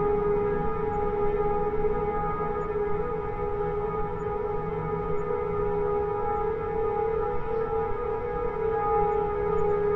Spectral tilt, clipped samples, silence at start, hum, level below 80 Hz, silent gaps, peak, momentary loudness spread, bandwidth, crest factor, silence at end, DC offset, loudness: -9.5 dB/octave; under 0.1%; 0 s; none; -38 dBFS; none; -14 dBFS; 5 LU; 4.1 kHz; 14 dB; 0 s; under 0.1%; -28 LUFS